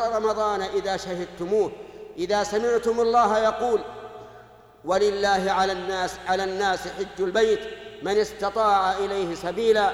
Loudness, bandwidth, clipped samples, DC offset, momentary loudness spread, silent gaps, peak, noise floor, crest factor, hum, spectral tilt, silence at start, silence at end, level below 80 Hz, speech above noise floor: -24 LUFS; 13 kHz; under 0.1%; under 0.1%; 12 LU; none; -10 dBFS; -49 dBFS; 14 dB; none; -4 dB/octave; 0 s; 0 s; -52 dBFS; 25 dB